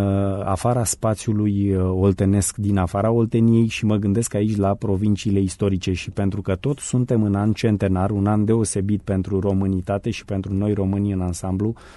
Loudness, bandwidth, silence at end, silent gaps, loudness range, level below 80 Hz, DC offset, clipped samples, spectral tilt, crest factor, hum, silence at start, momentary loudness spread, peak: -21 LUFS; 11.5 kHz; 0.05 s; none; 2 LU; -44 dBFS; under 0.1%; under 0.1%; -6.5 dB/octave; 14 dB; none; 0 s; 5 LU; -6 dBFS